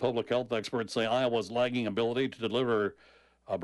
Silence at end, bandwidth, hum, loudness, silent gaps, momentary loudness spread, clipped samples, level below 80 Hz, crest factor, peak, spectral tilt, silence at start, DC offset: 0 s; 11.5 kHz; none; -31 LUFS; none; 4 LU; under 0.1%; -70 dBFS; 14 dB; -16 dBFS; -5.5 dB/octave; 0 s; under 0.1%